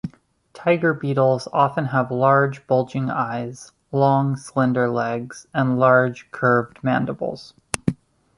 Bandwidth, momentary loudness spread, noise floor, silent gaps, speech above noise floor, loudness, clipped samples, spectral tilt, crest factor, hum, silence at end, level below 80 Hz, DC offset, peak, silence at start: 11.5 kHz; 12 LU; -50 dBFS; none; 30 dB; -21 LUFS; under 0.1%; -6.5 dB/octave; 20 dB; none; 0.45 s; -56 dBFS; under 0.1%; 0 dBFS; 0.05 s